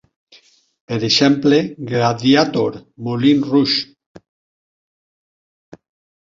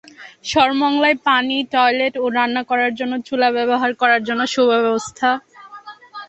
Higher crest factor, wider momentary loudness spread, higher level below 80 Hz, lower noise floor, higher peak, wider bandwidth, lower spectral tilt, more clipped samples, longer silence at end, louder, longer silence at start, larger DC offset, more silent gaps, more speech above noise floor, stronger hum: about the same, 16 dB vs 16 dB; first, 12 LU vs 9 LU; about the same, -58 dBFS vs -58 dBFS; first, -51 dBFS vs -39 dBFS; about the same, -2 dBFS vs -2 dBFS; second, 7.6 kHz vs 8.4 kHz; first, -5.5 dB/octave vs -3 dB/octave; neither; first, 2.35 s vs 0.05 s; about the same, -16 LUFS vs -17 LUFS; first, 0.9 s vs 0.2 s; neither; neither; first, 35 dB vs 22 dB; neither